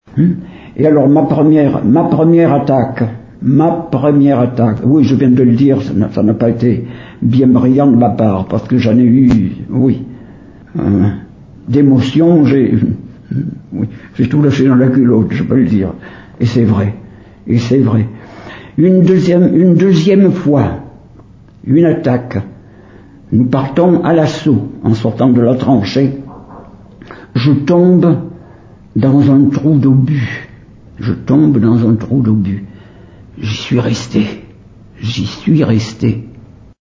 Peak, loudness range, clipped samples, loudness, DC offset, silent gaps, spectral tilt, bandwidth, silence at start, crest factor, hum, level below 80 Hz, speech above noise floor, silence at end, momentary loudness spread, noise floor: 0 dBFS; 4 LU; under 0.1%; -11 LUFS; under 0.1%; none; -8.5 dB/octave; 7.6 kHz; 0.15 s; 10 dB; none; -38 dBFS; 29 dB; 0.4 s; 13 LU; -38 dBFS